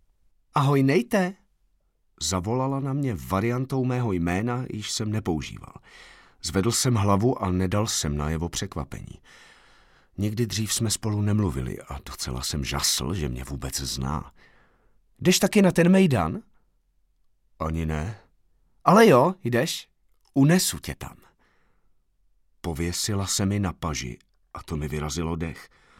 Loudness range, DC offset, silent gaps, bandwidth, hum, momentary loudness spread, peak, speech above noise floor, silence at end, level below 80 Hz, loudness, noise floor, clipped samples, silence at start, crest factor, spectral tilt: 7 LU; under 0.1%; none; 17 kHz; none; 16 LU; -4 dBFS; 43 dB; 0.35 s; -44 dBFS; -24 LUFS; -67 dBFS; under 0.1%; 0.55 s; 22 dB; -5 dB/octave